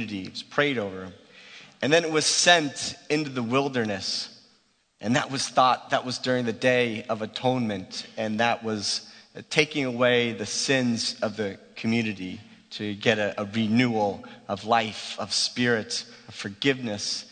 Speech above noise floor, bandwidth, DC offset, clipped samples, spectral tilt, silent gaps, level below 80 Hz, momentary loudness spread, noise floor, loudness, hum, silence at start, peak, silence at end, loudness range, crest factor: 39 dB; 9.4 kHz; under 0.1%; under 0.1%; -3.5 dB/octave; none; -68 dBFS; 13 LU; -65 dBFS; -25 LUFS; none; 0 s; -2 dBFS; 0.05 s; 3 LU; 24 dB